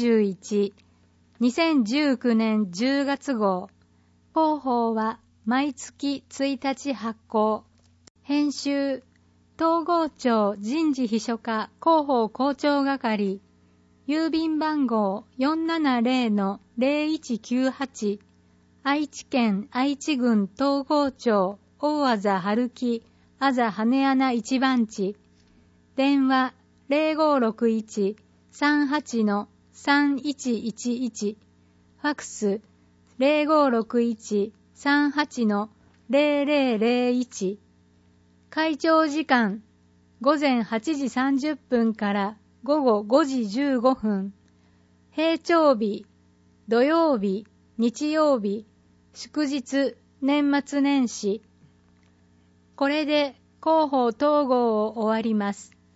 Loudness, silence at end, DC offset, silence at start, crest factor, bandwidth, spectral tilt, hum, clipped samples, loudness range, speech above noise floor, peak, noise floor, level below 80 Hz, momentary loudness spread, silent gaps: -24 LUFS; 0.3 s; under 0.1%; 0 s; 18 dB; 8 kHz; -5 dB/octave; none; under 0.1%; 3 LU; 37 dB; -6 dBFS; -60 dBFS; -68 dBFS; 9 LU; 8.10-8.15 s